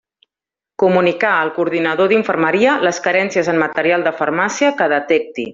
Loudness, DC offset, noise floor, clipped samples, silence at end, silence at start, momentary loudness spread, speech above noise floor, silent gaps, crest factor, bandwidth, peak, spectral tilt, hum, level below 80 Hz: -15 LUFS; under 0.1%; -88 dBFS; under 0.1%; 0 s; 0.8 s; 4 LU; 73 dB; none; 16 dB; 7.6 kHz; 0 dBFS; -4.5 dB/octave; none; -62 dBFS